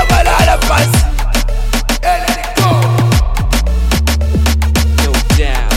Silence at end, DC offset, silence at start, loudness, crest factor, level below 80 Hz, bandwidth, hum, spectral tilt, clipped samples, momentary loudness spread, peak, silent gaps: 0 s; under 0.1%; 0 s; -12 LUFS; 10 dB; -14 dBFS; 16.5 kHz; none; -4.5 dB/octave; under 0.1%; 5 LU; 0 dBFS; none